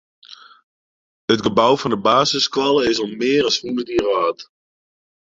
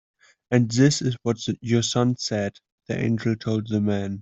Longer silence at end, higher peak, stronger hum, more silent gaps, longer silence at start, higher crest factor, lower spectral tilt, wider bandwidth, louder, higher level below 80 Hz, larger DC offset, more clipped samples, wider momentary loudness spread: first, 0.8 s vs 0 s; about the same, -2 dBFS vs -4 dBFS; neither; first, 0.63-1.28 s vs 2.72-2.78 s; second, 0.3 s vs 0.5 s; about the same, 18 dB vs 20 dB; second, -4 dB/octave vs -5.5 dB/octave; about the same, 7.8 kHz vs 8.2 kHz; first, -18 LUFS vs -24 LUFS; about the same, -54 dBFS vs -58 dBFS; neither; neither; about the same, 6 LU vs 8 LU